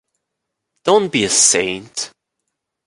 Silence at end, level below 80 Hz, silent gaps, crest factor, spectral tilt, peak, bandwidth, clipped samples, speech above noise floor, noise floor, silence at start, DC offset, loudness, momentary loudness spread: 0.8 s; -56 dBFS; none; 18 dB; -1.5 dB/octave; 0 dBFS; 11.5 kHz; under 0.1%; 62 dB; -78 dBFS; 0.85 s; under 0.1%; -14 LUFS; 15 LU